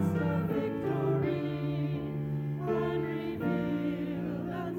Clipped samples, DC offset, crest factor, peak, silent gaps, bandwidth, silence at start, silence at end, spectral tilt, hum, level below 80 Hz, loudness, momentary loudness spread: under 0.1%; under 0.1%; 12 dB; -18 dBFS; none; 16.5 kHz; 0 s; 0 s; -9 dB/octave; none; -58 dBFS; -32 LUFS; 5 LU